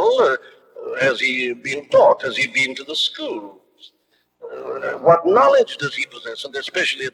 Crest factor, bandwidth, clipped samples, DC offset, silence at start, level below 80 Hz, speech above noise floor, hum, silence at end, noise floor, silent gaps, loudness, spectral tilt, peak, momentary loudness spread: 18 dB; 12 kHz; under 0.1%; under 0.1%; 0 s; -70 dBFS; 47 dB; 60 Hz at -60 dBFS; 0.05 s; -65 dBFS; none; -18 LUFS; -3.5 dB/octave; -2 dBFS; 16 LU